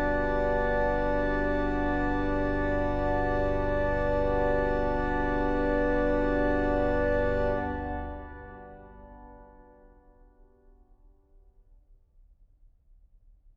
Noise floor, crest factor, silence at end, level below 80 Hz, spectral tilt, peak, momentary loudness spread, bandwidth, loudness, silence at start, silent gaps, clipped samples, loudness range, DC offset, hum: -59 dBFS; 14 dB; 4.1 s; -36 dBFS; -8.5 dB/octave; -14 dBFS; 16 LU; 6.4 kHz; -28 LUFS; 0 s; none; under 0.1%; 9 LU; under 0.1%; none